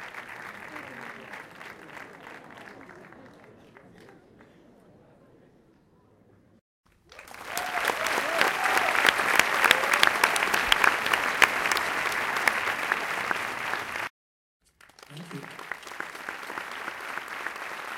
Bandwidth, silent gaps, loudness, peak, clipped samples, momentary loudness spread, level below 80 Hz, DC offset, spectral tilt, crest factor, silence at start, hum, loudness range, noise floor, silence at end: 17 kHz; 6.61-6.84 s, 14.10-14.60 s; -25 LUFS; 0 dBFS; under 0.1%; 23 LU; -62 dBFS; under 0.1%; -1 dB/octave; 30 dB; 0 s; none; 21 LU; -60 dBFS; 0 s